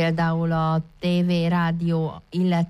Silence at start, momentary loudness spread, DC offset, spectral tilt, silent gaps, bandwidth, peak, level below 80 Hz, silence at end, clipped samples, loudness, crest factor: 0 s; 4 LU; under 0.1%; -8 dB/octave; none; 6.2 kHz; -12 dBFS; -50 dBFS; 0 s; under 0.1%; -23 LUFS; 10 dB